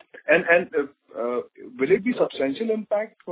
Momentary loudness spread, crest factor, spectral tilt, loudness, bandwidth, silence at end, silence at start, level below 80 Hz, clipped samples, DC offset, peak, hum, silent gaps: 12 LU; 20 dB; -9 dB/octave; -23 LUFS; 4 kHz; 0 s; 0.25 s; -66 dBFS; under 0.1%; under 0.1%; -4 dBFS; none; none